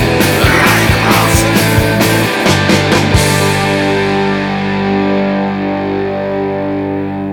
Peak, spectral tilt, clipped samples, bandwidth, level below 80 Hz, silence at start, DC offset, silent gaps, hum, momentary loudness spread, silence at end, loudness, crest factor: 0 dBFS; -4.5 dB/octave; under 0.1%; over 20 kHz; -28 dBFS; 0 s; under 0.1%; none; 50 Hz at -35 dBFS; 7 LU; 0 s; -11 LUFS; 12 dB